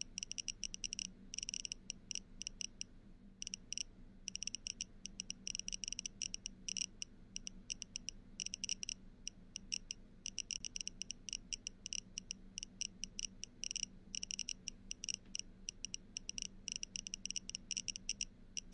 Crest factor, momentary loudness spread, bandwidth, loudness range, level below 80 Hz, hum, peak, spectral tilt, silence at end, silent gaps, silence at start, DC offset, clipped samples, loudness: 26 dB; 7 LU; 11.5 kHz; 2 LU; -60 dBFS; none; -22 dBFS; 0.5 dB/octave; 0 s; none; 0 s; under 0.1%; under 0.1%; -45 LUFS